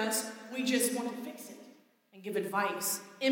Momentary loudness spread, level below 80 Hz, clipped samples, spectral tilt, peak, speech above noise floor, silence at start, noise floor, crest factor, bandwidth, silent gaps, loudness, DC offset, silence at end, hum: 17 LU; under -90 dBFS; under 0.1%; -2.5 dB/octave; -16 dBFS; 27 dB; 0 s; -60 dBFS; 18 dB; 17 kHz; none; -33 LUFS; under 0.1%; 0 s; none